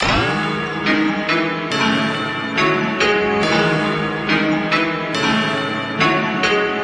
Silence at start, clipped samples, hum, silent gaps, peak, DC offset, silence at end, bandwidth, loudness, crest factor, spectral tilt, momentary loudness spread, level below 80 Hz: 0 s; under 0.1%; none; none; -2 dBFS; under 0.1%; 0 s; 10.5 kHz; -17 LUFS; 16 dB; -5 dB/octave; 4 LU; -42 dBFS